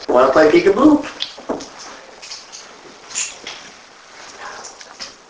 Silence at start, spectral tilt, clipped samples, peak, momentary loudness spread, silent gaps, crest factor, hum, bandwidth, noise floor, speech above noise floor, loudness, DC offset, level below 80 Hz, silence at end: 0 s; -3.5 dB/octave; under 0.1%; 0 dBFS; 25 LU; none; 18 dB; none; 8 kHz; -42 dBFS; 30 dB; -15 LUFS; under 0.1%; -50 dBFS; 0.2 s